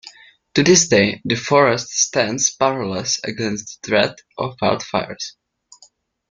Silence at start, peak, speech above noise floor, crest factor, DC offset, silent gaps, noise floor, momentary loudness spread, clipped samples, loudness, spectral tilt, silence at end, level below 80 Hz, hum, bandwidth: 0.05 s; -2 dBFS; 35 dB; 18 dB; under 0.1%; none; -54 dBFS; 15 LU; under 0.1%; -18 LUFS; -3 dB/octave; 1 s; -56 dBFS; none; 10.5 kHz